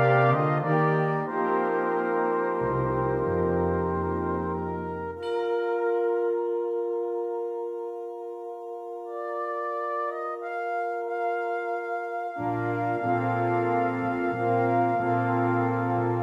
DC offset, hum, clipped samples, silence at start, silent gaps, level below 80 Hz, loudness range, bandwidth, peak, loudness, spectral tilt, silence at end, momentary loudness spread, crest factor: under 0.1%; none; under 0.1%; 0 s; none; -56 dBFS; 7 LU; 7.4 kHz; -10 dBFS; -27 LUFS; -9.5 dB/octave; 0 s; 9 LU; 16 dB